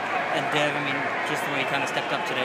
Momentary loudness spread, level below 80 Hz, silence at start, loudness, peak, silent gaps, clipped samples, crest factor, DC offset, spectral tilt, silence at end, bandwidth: 3 LU; -76 dBFS; 0 s; -25 LUFS; -8 dBFS; none; under 0.1%; 18 dB; under 0.1%; -3.5 dB/octave; 0 s; 15.5 kHz